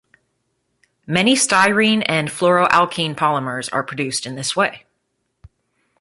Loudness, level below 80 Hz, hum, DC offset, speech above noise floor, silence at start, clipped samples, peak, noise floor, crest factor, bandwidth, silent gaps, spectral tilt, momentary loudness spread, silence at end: -17 LUFS; -58 dBFS; none; under 0.1%; 54 dB; 1.1 s; under 0.1%; -2 dBFS; -72 dBFS; 18 dB; 11.5 kHz; none; -3.5 dB/octave; 9 LU; 1.25 s